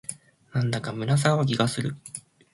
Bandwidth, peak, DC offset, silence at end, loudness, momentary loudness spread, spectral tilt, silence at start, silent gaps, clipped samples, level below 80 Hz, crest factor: 11.5 kHz; -6 dBFS; under 0.1%; 0.35 s; -25 LUFS; 16 LU; -5.5 dB/octave; 0.1 s; none; under 0.1%; -60 dBFS; 20 dB